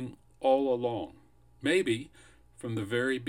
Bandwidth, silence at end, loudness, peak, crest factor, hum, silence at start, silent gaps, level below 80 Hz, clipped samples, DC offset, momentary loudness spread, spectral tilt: 16 kHz; 0 s; -30 LUFS; -14 dBFS; 18 dB; none; 0 s; none; -64 dBFS; under 0.1%; under 0.1%; 16 LU; -5.5 dB/octave